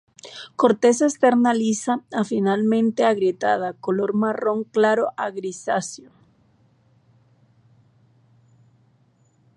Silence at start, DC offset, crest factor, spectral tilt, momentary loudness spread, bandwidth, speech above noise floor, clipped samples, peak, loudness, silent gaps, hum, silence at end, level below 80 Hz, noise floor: 0.25 s; under 0.1%; 20 dB; -5 dB/octave; 11 LU; 11 kHz; 40 dB; under 0.1%; -2 dBFS; -21 LUFS; none; none; 3.6 s; -74 dBFS; -61 dBFS